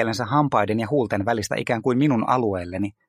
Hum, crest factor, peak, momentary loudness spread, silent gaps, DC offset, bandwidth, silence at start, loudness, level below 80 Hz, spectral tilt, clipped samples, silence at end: none; 18 dB; -4 dBFS; 5 LU; none; under 0.1%; 15 kHz; 0 s; -22 LUFS; -56 dBFS; -6.5 dB/octave; under 0.1%; 0.2 s